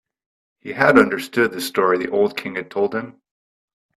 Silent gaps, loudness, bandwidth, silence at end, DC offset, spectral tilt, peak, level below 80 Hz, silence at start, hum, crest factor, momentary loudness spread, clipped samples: none; -19 LUFS; 13.5 kHz; 0.85 s; under 0.1%; -5 dB/octave; 0 dBFS; -60 dBFS; 0.65 s; none; 20 dB; 16 LU; under 0.1%